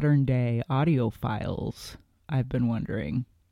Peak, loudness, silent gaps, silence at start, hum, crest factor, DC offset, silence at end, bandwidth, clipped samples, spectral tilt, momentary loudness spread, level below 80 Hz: -12 dBFS; -28 LUFS; none; 0 s; none; 14 dB; under 0.1%; 0.3 s; 13 kHz; under 0.1%; -8.5 dB/octave; 10 LU; -48 dBFS